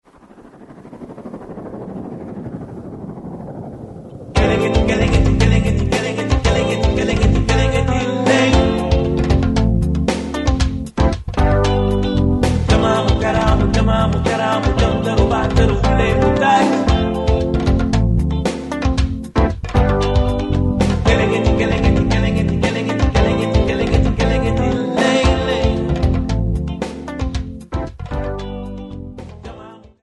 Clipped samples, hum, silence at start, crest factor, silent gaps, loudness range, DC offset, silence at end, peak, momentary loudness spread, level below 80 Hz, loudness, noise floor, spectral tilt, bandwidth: under 0.1%; none; 0.4 s; 16 dB; none; 8 LU; under 0.1%; 0.25 s; 0 dBFS; 16 LU; -22 dBFS; -17 LUFS; -43 dBFS; -6.5 dB/octave; 11.5 kHz